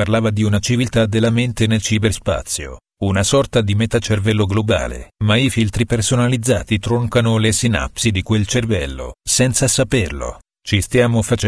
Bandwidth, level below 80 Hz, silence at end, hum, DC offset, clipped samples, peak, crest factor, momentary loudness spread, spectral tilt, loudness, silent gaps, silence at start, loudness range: 11 kHz; -34 dBFS; 0 s; none; under 0.1%; under 0.1%; 0 dBFS; 16 dB; 7 LU; -5 dB/octave; -17 LUFS; none; 0 s; 1 LU